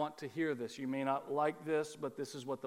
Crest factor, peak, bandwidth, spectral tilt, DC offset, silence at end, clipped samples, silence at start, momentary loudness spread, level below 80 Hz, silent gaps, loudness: 18 dB; -20 dBFS; 16 kHz; -5.5 dB/octave; under 0.1%; 0 s; under 0.1%; 0 s; 7 LU; -86 dBFS; none; -38 LUFS